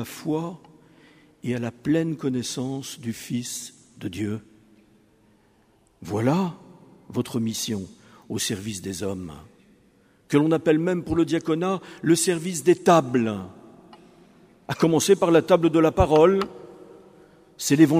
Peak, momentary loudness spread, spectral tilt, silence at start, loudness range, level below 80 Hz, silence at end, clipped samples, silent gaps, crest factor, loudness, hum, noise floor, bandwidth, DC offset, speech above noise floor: -2 dBFS; 16 LU; -5.5 dB/octave; 0 s; 10 LU; -48 dBFS; 0 s; under 0.1%; none; 22 dB; -23 LUFS; none; -61 dBFS; 15.5 kHz; under 0.1%; 38 dB